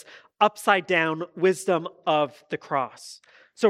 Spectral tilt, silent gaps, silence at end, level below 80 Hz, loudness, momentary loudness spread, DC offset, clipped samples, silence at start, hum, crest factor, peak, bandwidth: -4.5 dB/octave; none; 0 s; -80 dBFS; -24 LUFS; 13 LU; under 0.1%; under 0.1%; 0.4 s; none; 20 dB; -4 dBFS; 15 kHz